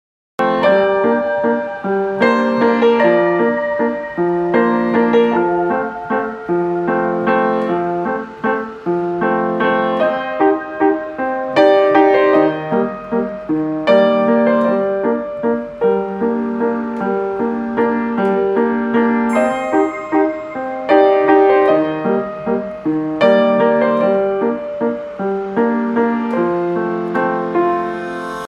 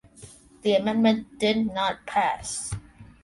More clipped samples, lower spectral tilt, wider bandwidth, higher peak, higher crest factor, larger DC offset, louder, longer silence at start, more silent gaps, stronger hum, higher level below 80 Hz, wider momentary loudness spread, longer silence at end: neither; first, -7.5 dB/octave vs -4 dB/octave; about the same, 10.5 kHz vs 11.5 kHz; first, 0 dBFS vs -8 dBFS; about the same, 16 dB vs 18 dB; neither; first, -16 LUFS vs -25 LUFS; first, 0.4 s vs 0.2 s; neither; neither; about the same, -54 dBFS vs -52 dBFS; about the same, 8 LU vs 9 LU; second, 0 s vs 0.2 s